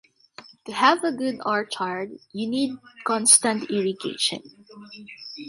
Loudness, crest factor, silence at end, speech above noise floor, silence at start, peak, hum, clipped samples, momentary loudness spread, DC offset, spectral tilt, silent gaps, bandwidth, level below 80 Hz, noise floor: -22 LUFS; 24 dB; 0 s; 24 dB; 0.4 s; -2 dBFS; none; under 0.1%; 23 LU; under 0.1%; -1.5 dB/octave; none; 12 kHz; -72 dBFS; -49 dBFS